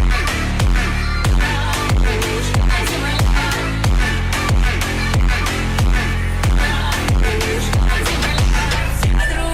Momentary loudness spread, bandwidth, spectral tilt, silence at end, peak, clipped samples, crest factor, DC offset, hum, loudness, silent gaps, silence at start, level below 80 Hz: 2 LU; 15.5 kHz; -4.5 dB/octave; 0 s; -4 dBFS; under 0.1%; 12 dB; under 0.1%; none; -18 LUFS; none; 0 s; -18 dBFS